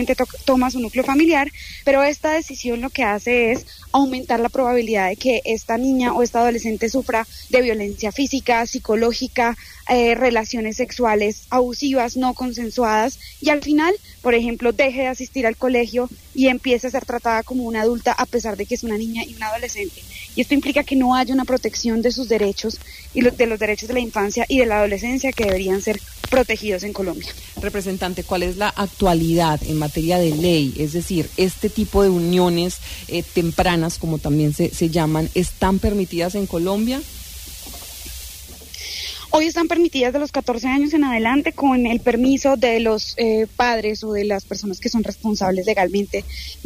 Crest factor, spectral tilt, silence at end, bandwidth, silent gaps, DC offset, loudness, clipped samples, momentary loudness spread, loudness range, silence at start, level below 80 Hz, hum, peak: 14 dB; -5 dB/octave; 0 s; 15.5 kHz; none; under 0.1%; -20 LUFS; under 0.1%; 9 LU; 4 LU; 0 s; -38 dBFS; none; -4 dBFS